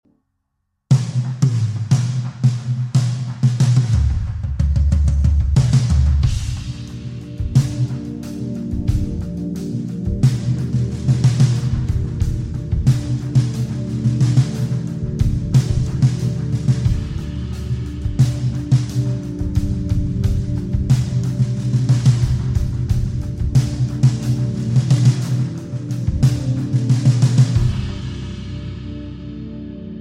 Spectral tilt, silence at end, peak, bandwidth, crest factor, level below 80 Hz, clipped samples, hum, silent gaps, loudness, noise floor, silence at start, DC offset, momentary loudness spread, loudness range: -7.5 dB/octave; 0 s; -2 dBFS; 10.5 kHz; 16 dB; -26 dBFS; under 0.1%; none; none; -19 LUFS; -72 dBFS; 0.9 s; under 0.1%; 11 LU; 3 LU